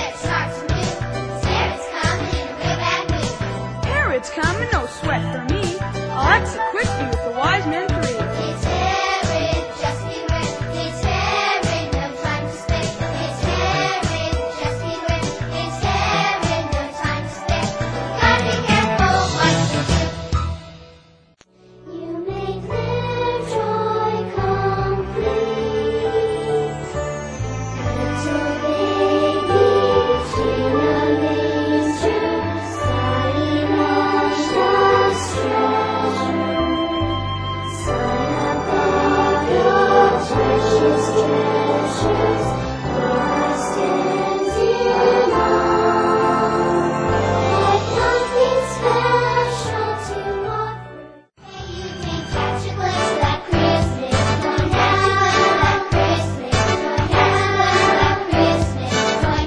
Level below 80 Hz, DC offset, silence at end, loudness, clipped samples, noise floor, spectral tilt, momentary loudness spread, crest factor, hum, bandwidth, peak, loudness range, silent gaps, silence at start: -34 dBFS; under 0.1%; 0 s; -19 LUFS; under 0.1%; -52 dBFS; -5.5 dB/octave; 9 LU; 18 dB; none; 10.5 kHz; -2 dBFS; 5 LU; none; 0 s